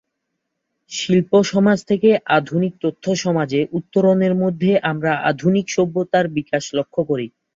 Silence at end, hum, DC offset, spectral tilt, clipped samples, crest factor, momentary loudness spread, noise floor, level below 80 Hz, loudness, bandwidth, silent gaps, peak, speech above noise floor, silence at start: 0.25 s; none; under 0.1%; -6 dB/octave; under 0.1%; 16 dB; 7 LU; -76 dBFS; -60 dBFS; -18 LUFS; 7.6 kHz; none; -2 dBFS; 59 dB; 0.9 s